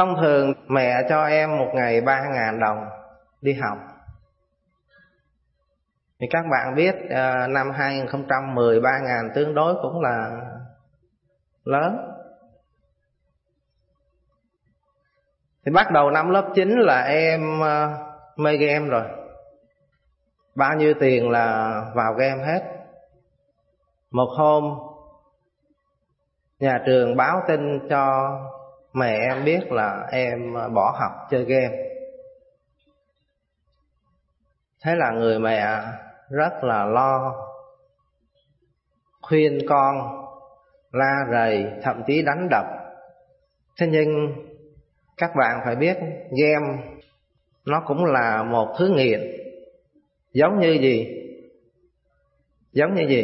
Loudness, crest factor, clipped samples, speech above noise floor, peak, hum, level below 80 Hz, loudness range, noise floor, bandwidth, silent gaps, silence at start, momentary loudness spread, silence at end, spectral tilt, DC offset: -21 LUFS; 20 dB; under 0.1%; 53 dB; -4 dBFS; none; -64 dBFS; 8 LU; -73 dBFS; 5.8 kHz; none; 0 s; 16 LU; 0 s; -10.5 dB/octave; under 0.1%